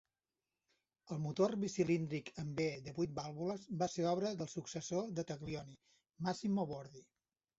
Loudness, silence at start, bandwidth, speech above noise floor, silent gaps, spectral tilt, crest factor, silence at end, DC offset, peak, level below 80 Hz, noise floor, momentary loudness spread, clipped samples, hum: -40 LUFS; 1.05 s; 8 kHz; over 51 dB; none; -6.5 dB/octave; 20 dB; 0.6 s; under 0.1%; -20 dBFS; -72 dBFS; under -90 dBFS; 9 LU; under 0.1%; none